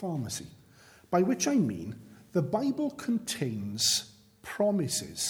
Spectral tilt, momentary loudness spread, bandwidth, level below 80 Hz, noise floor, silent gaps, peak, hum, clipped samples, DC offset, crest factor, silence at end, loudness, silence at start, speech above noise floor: -4 dB/octave; 17 LU; over 20 kHz; -66 dBFS; -57 dBFS; none; -12 dBFS; none; under 0.1%; under 0.1%; 18 dB; 0 s; -30 LUFS; 0 s; 28 dB